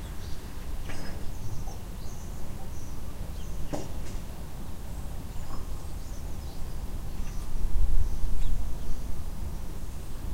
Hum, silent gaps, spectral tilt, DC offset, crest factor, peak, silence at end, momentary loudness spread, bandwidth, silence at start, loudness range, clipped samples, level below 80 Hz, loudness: none; none; -5.5 dB/octave; under 0.1%; 16 dB; -8 dBFS; 0 s; 7 LU; 15.5 kHz; 0 s; 4 LU; under 0.1%; -32 dBFS; -39 LUFS